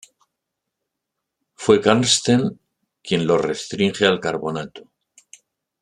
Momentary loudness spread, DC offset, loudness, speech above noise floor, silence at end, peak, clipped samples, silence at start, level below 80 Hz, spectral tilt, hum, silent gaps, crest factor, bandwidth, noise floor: 12 LU; under 0.1%; -19 LUFS; 62 dB; 1 s; -2 dBFS; under 0.1%; 1.6 s; -60 dBFS; -4 dB/octave; none; none; 20 dB; 12 kHz; -81 dBFS